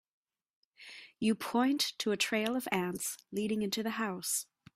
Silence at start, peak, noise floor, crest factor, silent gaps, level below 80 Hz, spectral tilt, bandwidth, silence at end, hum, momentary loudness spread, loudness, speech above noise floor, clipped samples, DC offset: 0.8 s; -16 dBFS; -53 dBFS; 20 dB; none; -74 dBFS; -3 dB/octave; 16 kHz; 0.3 s; none; 7 LU; -33 LUFS; 20 dB; under 0.1%; under 0.1%